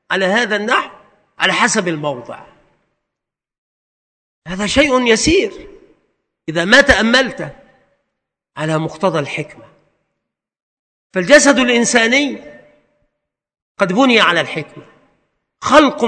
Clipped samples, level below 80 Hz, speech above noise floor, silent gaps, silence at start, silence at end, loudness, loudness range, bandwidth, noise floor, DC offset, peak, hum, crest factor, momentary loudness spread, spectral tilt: 0.3%; -42 dBFS; 69 dB; 3.58-4.42 s, 10.62-11.10 s, 13.62-13.75 s; 0.1 s; 0 s; -13 LUFS; 9 LU; 11 kHz; -82 dBFS; under 0.1%; 0 dBFS; none; 16 dB; 19 LU; -3 dB/octave